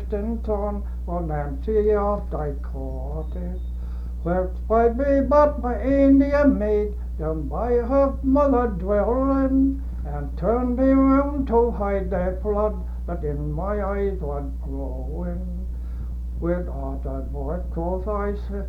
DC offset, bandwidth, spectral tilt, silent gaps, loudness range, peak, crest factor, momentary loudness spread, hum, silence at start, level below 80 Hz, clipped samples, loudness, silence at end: under 0.1%; 5.2 kHz; -10.5 dB/octave; none; 9 LU; -4 dBFS; 18 dB; 13 LU; 60 Hz at -30 dBFS; 0 s; -28 dBFS; under 0.1%; -23 LUFS; 0 s